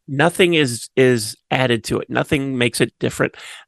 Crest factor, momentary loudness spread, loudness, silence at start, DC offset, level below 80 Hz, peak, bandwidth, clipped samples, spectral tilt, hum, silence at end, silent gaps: 18 dB; 7 LU; -18 LUFS; 0.1 s; under 0.1%; -50 dBFS; 0 dBFS; 12.5 kHz; under 0.1%; -4.5 dB/octave; none; 0.05 s; none